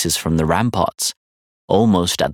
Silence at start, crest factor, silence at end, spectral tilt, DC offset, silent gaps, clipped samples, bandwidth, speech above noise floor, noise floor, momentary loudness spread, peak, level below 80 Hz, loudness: 0 s; 16 dB; 0 s; -4.5 dB/octave; under 0.1%; 1.17-1.68 s; under 0.1%; 18.5 kHz; over 73 dB; under -90 dBFS; 6 LU; -2 dBFS; -42 dBFS; -18 LUFS